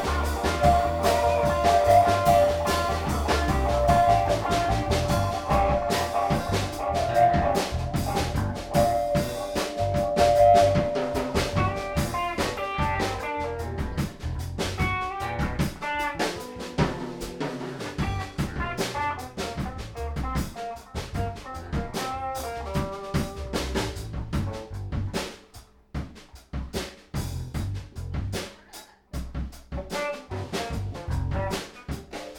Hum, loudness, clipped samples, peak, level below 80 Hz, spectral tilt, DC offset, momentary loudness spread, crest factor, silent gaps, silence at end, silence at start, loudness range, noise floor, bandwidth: none; -26 LUFS; under 0.1%; -8 dBFS; -36 dBFS; -5.5 dB/octave; under 0.1%; 14 LU; 18 dB; none; 0 s; 0 s; 12 LU; -50 dBFS; 19 kHz